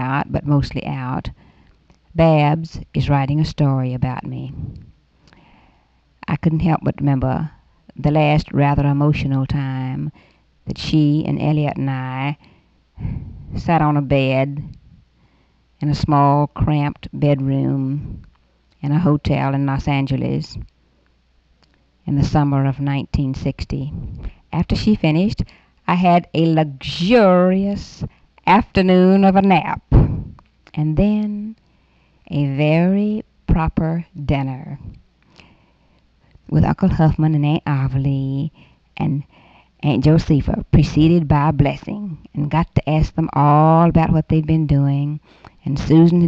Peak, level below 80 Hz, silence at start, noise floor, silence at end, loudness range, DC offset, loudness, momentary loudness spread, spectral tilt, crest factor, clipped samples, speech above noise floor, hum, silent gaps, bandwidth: 0 dBFS; -32 dBFS; 0 s; -58 dBFS; 0 s; 6 LU; under 0.1%; -18 LUFS; 15 LU; -8.5 dB/octave; 18 dB; under 0.1%; 41 dB; none; none; 7.4 kHz